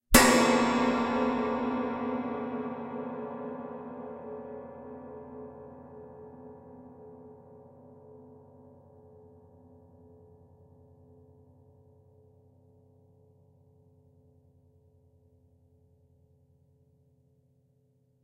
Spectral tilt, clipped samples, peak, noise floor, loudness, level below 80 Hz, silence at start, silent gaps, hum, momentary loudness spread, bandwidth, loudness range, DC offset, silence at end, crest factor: -3.5 dB/octave; under 0.1%; -2 dBFS; -69 dBFS; -29 LUFS; -50 dBFS; 0.1 s; none; none; 28 LU; 16 kHz; 27 LU; under 0.1%; 9.6 s; 32 dB